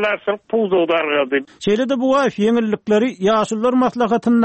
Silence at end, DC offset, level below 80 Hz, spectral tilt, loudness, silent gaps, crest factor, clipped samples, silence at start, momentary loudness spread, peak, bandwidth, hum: 0 s; under 0.1%; -56 dBFS; -5.5 dB/octave; -17 LUFS; none; 10 dB; under 0.1%; 0 s; 4 LU; -6 dBFS; 8.6 kHz; none